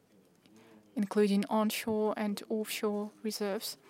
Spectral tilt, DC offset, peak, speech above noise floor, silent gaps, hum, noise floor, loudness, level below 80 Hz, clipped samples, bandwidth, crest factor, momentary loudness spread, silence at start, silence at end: -5 dB/octave; under 0.1%; -16 dBFS; 32 dB; none; none; -64 dBFS; -33 LUFS; -78 dBFS; under 0.1%; 16 kHz; 18 dB; 8 LU; 0.95 s; 0.15 s